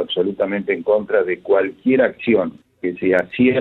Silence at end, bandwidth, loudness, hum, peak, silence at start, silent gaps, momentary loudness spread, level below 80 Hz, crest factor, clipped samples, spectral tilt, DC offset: 0 s; 4.2 kHz; -19 LUFS; none; -2 dBFS; 0 s; none; 5 LU; -60 dBFS; 16 dB; under 0.1%; -8 dB/octave; under 0.1%